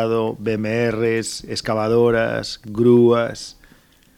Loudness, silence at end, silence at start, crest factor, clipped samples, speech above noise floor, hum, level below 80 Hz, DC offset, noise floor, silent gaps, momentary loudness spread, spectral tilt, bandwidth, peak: -19 LUFS; 0.65 s; 0 s; 14 dB; under 0.1%; 34 dB; none; -50 dBFS; under 0.1%; -52 dBFS; none; 12 LU; -6 dB/octave; 14 kHz; -4 dBFS